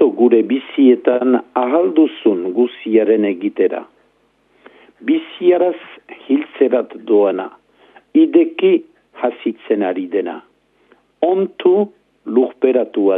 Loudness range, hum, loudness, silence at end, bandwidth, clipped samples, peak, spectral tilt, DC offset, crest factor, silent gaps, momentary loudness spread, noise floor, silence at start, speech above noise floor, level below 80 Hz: 5 LU; none; -16 LUFS; 0 s; 3.8 kHz; under 0.1%; 0 dBFS; -9.5 dB/octave; under 0.1%; 16 dB; none; 11 LU; -58 dBFS; 0 s; 43 dB; -74 dBFS